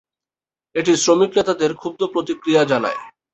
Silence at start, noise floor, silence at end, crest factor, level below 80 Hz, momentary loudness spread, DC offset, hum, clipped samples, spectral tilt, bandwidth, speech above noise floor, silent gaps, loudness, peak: 0.75 s; under -90 dBFS; 0.25 s; 18 dB; -60 dBFS; 10 LU; under 0.1%; none; under 0.1%; -4 dB/octave; 8.2 kHz; over 72 dB; none; -18 LUFS; -2 dBFS